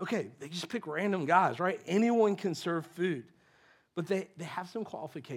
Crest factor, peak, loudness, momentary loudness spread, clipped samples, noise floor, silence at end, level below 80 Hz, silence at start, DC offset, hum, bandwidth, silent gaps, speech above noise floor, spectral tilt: 20 dB; -12 dBFS; -32 LUFS; 14 LU; under 0.1%; -65 dBFS; 0 s; -86 dBFS; 0 s; under 0.1%; none; 15.5 kHz; none; 33 dB; -6 dB/octave